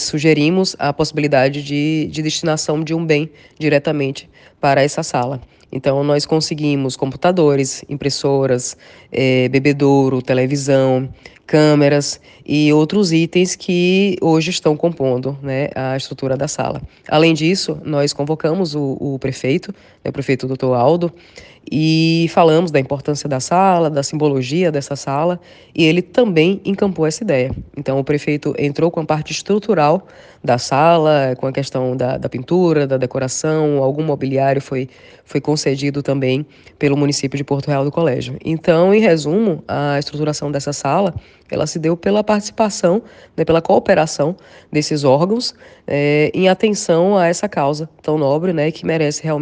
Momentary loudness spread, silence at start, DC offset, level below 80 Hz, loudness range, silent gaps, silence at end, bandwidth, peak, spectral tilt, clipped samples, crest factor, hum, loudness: 9 LU; 0 s; under 0.1%; -50 dBFS; 3 LU; none; 0 s; 10 kHz; 0 dBFS; -5.5 dB/octave; under 0.1%; 16 dB; none; -16 LUFS